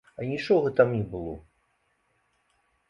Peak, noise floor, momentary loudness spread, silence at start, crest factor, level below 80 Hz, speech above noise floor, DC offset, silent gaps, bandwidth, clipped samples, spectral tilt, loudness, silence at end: -6 dBFS; -72 dBFS; 16 LU; 0.2 s; 22 dB; -56 dBFS; 46 dB; under 0.1%; none; 7.4 kHz; under 0.1%; -8 dB/octave; -26 LUFS; 1.5 s